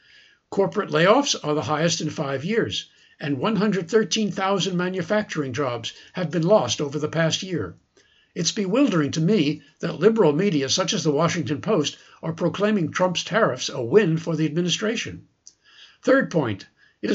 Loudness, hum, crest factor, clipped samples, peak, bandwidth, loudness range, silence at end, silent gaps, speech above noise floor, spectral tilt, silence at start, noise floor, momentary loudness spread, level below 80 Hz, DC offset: -22 LUFS; none; 20 dB; under 0.1%; -4 dBFS; 8 kHz; 2 LU; 0 s; none; 38 dB; -4.5 dB/octave; 0.5 s; -60 dBFS; 11 LU; -64 dBFS; under 0.1%